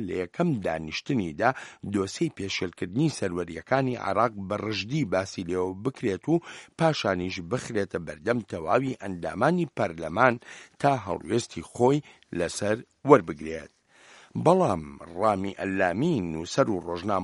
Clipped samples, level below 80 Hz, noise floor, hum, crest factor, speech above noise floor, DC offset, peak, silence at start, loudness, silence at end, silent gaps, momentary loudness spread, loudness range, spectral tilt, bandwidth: under 0.1%; -58 dBFS; -55 dBFS; none; 26 dB; 28 dB; under 0.1%; 0 dBFS; 0 s; -27 LUFS; 0 s; none; 9 LU; 3 LU; -6 dB/octave; 11.5 kHz